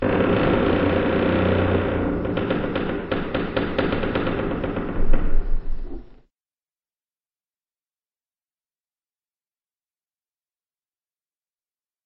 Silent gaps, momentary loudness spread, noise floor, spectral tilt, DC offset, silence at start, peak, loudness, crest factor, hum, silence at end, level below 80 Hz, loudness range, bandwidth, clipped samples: none; 11 LU; under -90 dBFS; -5.5 dB/octave; under 0.1%; 0 s; -2 dBFS; -23 LUFS; 20 dB; none; 6.05 s; -28 dBFS; 13 LU; 4.8 kHz; under 0.1%